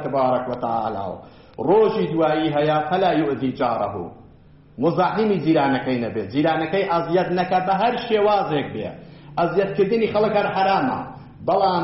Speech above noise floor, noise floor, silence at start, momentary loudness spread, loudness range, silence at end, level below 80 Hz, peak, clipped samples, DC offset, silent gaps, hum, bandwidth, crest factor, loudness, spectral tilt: 28 dB; -48 dBFS; 0 s; 11 LU; 2 LU; 0 s; -54 dBFS; -8 dBFS; under 0.1%; under 0.1%; none; none; 6 kHz; 14 dB; -21 LUFS; -5 dB/octave